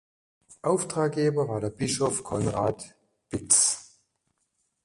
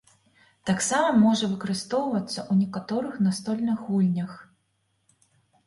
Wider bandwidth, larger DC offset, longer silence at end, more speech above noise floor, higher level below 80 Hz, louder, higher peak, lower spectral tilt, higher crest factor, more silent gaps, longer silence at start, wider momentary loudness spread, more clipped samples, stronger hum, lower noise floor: about the same, 11.5 kHz vs 11.5 kHz; neither; second, 1 s vs 1.25 s; about the same, 50 dB vs 48 dB; first, -56 dBFS vs -68 dBFS; about the same, -25 LUFS vs -25 LUFS; first, -6 dBFS vs -10 dBFS; about the same, -4 dB/octave vs -5 dB/octave; first, 22 dB vs 16 dB; neither; second, 0.5 s vs 0.65 s; first, 16 LU vs 9 LU; neither; neither; first, -76 dBFS vs -72 dBFS